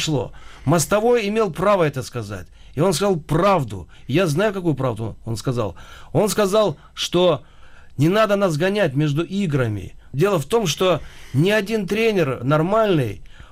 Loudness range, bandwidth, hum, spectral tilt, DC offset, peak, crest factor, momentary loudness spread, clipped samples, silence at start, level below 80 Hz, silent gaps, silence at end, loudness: 2 LU; 16 kHz; none; -5.5 dB/octave; under 0.1%; -8 dBFS; 12 dB; 12 LU; under 0.1%; 0 s; -44 dBFS; none; 0.2 s; -20 LUFS